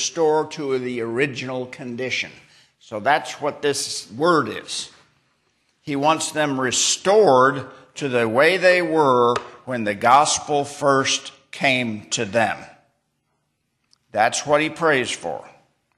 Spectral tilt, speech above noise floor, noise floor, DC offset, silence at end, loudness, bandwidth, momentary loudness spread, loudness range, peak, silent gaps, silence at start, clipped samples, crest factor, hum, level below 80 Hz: -3 dB/octave; 52 dB; -72 dBFS; under 0.1%; 0.5 s; -20 LUFS; 13 kHz; 14 LU; 7 LU; -2 dBFS; none; 0 s; under 0.1%; 18 dB; none; -66 dBFS